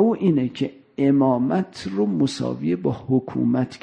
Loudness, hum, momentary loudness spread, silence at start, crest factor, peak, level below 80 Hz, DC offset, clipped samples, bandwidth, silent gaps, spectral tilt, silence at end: -22 LUFS; none; 7 LU; 0 s; 14 dB; -6 dBFS; -58 dBFS; under 0.1%; under 0.1%; 9.8 kHz; none; -7.5 dB/octave; 0.05 s